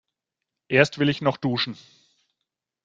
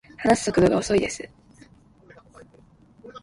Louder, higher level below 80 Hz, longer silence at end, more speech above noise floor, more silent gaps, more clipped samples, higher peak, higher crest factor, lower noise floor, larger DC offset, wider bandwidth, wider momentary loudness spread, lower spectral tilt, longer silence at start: about the same, -23 LUFS vs -21 LUFS; second, -62 dBFS vs -50 dBFS; first, 1.1 s vs 0.05 s; first, 62 dB vs 33 dB; neither; neither; about the same, -2 dBFS vs -4 dBFS; about the same, 24 dB vs 22 dB; first, -85 dBFS vs -54 dBFS; neither; second, 7.8 kHz vs 11.5 kHz; second, 9 LU vs 21 LU; about the same, -6 dB/octave vs -5 dB/octave; first, 0.7 s vs 0.2 s